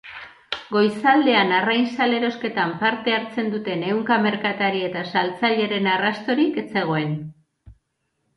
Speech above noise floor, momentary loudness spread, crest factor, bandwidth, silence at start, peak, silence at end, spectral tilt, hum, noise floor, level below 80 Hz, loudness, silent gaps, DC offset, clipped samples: 52 dB; 8 LU; 16 dB; 11 kHz; 0.05 s; -6 dBFS; 0.65 s; -6.5 dB/octave; none; -73 dBFS; -62 dBFS; -21 LUFS; none; under 0.1%; under 0.1%